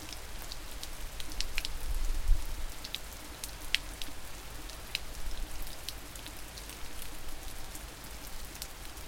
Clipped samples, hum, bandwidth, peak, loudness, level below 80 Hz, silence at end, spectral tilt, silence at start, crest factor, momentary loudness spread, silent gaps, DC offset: under 0.1%; none; 17 kHz; -4 dBFS; -40 LUFS; -38 dBFS; 0 s; -2 dB/octave; 0 s; 30 dB; 9 LU; none; under 0.1%